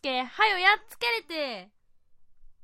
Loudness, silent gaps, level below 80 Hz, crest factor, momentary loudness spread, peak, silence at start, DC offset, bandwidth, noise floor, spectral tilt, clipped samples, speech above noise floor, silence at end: -25 LUFS; none; -62 dBFS; 22 dB; 13 LU; -8 dBFS; 0.05 s; under 0.1%; 16 kHz; -56 dBFS; -1.5 dB/octave; under 0.1%; 28 dB; 0.1 s